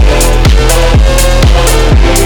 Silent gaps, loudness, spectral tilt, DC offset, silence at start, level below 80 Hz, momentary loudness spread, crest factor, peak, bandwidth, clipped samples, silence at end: none; -8 LUFS; -4.5 dB/octave; under 0.1%; 0 s; -6 dBFS; 1 LU; 6 dB; 0 dBFS; 20 kHz; 0.5%; 0 s